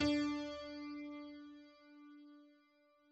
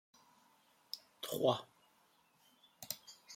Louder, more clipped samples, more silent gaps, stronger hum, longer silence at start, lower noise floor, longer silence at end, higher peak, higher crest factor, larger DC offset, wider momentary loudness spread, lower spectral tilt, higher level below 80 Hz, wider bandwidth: second, -43 LUFS vs -40 LUFS; neither; neither; neither; second, 0 s vs 0.95 s; about the same, -72 dBFS vs -72 dBFS; first, 0.6 s vs 0 s; second, -24 dBFS vs -18 dBFS; second, 20 dB vs 26 dB; neither; first, 23 LU vs 18 LU; about the same, -3.5 dB/octave vs -4 dB/octave; first, -66 dBFS vs -84 dBFS; second, 8 kHz vs 16.5 kHz